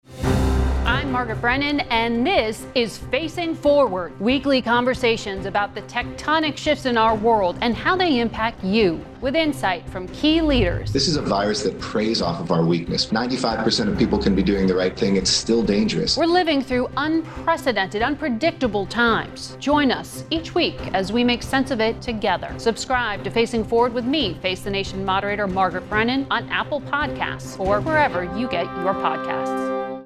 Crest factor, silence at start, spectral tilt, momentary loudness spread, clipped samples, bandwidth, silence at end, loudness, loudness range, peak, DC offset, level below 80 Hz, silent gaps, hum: 16 dB; 0.1 s; -5 dB/octave; 6 LU; under 0.1%; 14 kHz; 0 s; -21 LUFS; 2 LU; -4 dBFS; under 0.1%; -36 dBFS; none; none